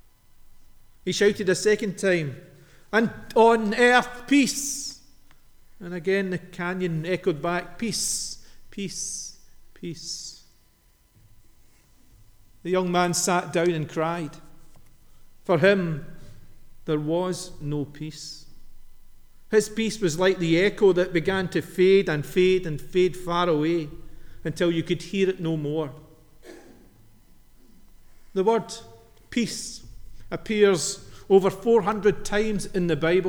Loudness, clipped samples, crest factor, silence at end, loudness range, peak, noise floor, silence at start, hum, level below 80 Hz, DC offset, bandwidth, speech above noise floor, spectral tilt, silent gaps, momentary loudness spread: -24 LUFS; under 0.1%; 22 dB; 0 s; 10 LU; -4 dBFS; -60 dBFS; 0.55 s; none; -48 dBFS; under 0.1%; 20 kHz; 37 dB; -4.5 dB/octave; none; 16 LU